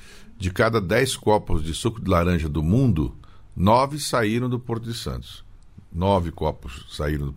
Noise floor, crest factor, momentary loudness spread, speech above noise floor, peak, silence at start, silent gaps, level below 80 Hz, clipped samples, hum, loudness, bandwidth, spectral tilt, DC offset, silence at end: -45 dBFS; 18 dB; 12 LU; 23 dB; -6 dBFS; 0.05 s; none; -36 dBFS; under 0.1%; none; -23 LUFS; 16 kHz; -6 dB/octave; under 0.1%; 0 s